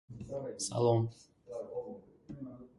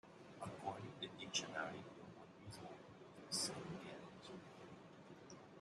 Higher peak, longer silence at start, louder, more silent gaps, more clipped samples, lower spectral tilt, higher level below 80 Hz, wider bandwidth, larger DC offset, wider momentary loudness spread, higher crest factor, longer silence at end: first, -16 dBFS vs -26 dBFS; about the same, 0.1 s vs 0.05 s; first, -35 LUFS vs -49 LUFS; neither; neither; first, -6 dB/octave vs -2.5 dB/octave; first, -66 dBFS vs -82 dBFS; about the same, 11.5 kHz vs 12 kHz; neither; about the same, 19 LU vs 17 LU; second, 20 dB vs 26 dB; about the same, 0.1 s vs 0 s